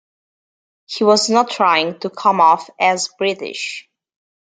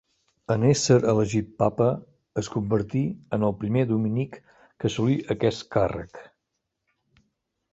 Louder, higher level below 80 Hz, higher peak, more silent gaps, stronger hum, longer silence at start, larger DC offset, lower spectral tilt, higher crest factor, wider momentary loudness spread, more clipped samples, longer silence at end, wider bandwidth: first, -16 LUFS vs -25 LUFS; second, -72 dBFS vs -52 dBFS; first, -2 dBFS vs -6 dBFS; neither; neither; first, 0.9 s vs 0.5 s; neither; second, -3 dB/octave vs -6.5 dB/octave; about the same, 16 dB vs 18 dB; about the same, 12 LU vs 11 LU; neither; second, 0.6 s vs 1.5 s; first, 9.6 kHz vs 8.2 kHz